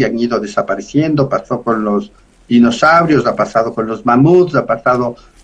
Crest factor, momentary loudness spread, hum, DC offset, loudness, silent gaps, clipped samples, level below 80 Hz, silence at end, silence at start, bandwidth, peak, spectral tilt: 12 dB; 9 LU; none; under 0.1%; -13 LUFS; none; under 0.1%; -46 dBFS; 0.3 s; 0 s; 9.2 kHz; 0 dBFS; -7 dB/octave